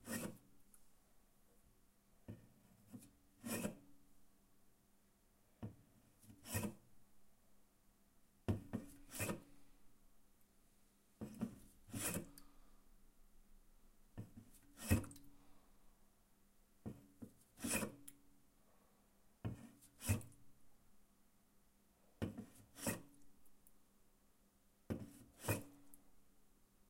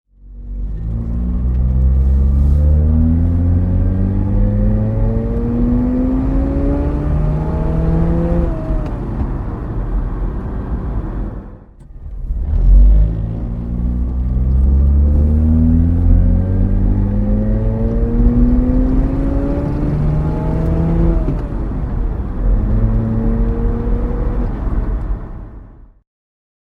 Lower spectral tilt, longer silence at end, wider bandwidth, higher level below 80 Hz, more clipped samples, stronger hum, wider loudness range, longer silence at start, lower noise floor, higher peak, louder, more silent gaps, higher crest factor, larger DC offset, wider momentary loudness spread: second, -4.5 dB/octave vs -11.5 dB/octave; second, 0.25 s vs 1 s; first, 16 kHz vs 2.8 kHz; second, -66 dBFS vs -16 dBFS; neither; neither; about the same, 5 LU vs 6 LU; second, 0 s vs 0.25 s; first, -74 dBFS vs -37 dBFS; second, -22 dBFS vs 0 dBFS; second, -47 LUFS vs -17 LUFS; neither; first, 30 dB vs 14 dB; neither; first, 21 LU vs 10 LU